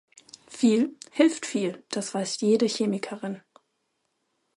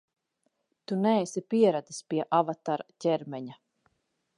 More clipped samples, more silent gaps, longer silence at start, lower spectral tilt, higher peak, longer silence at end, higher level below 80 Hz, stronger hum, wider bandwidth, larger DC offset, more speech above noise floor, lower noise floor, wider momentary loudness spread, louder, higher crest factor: neither; neither; second, 0.5 s vs 0.9 s; second, -4.5 dB/octave vs -6 dB/octave; about the same, -8 dBFS vs -10 dBFS; first, 1.15 s vs 0.85 s; about the same, -78 dBFS vs -82 dBFS; neither; about the same, 11.5 kHz vs 11.5 kHz; neither; about the same, 51 dB vs 49 dB; about the same, -76 dBFS vs -77 dBFS; about the same, 13 LU vs 11 LU; about the same, -26 LUFS vs -28 LUFS; about the same, 20 dB vs 20 dB